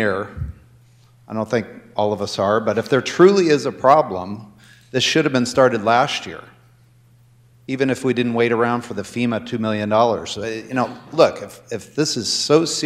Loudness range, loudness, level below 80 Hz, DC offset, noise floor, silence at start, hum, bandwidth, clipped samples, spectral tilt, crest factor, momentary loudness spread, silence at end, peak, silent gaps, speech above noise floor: 5 LU; -19 LUFS; -50 dBFS; under 0.1%; -52 dBFS; 0 s; none; 15 kHz; under 0.1%; -4.5 dB/octave; 18 dB; 15 LU; 0 s; 0 dBFS; none; 33 dB